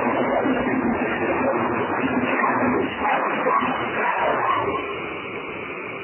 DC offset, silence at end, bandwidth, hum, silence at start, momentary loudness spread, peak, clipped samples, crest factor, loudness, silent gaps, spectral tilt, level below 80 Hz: under 0.1%; 0 s; 3.2 kHz; none; 0 s; 9 LU; -8 dBFS; under 0.1%; 14 dB; -22 LUFS; none; -9.5 dB/octave; -50 dBFS